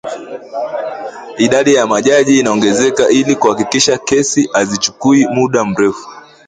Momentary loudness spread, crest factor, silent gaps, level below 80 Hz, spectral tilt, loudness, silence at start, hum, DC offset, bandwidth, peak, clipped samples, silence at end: 13 LU; 12 dB; none; -52 dBFS; -3.5 dB/octave; -12 LUFS; 0.05 s; none; under 0.1%; 9.6 kHz; 0 dBFS; under 0.1%; 0.3 s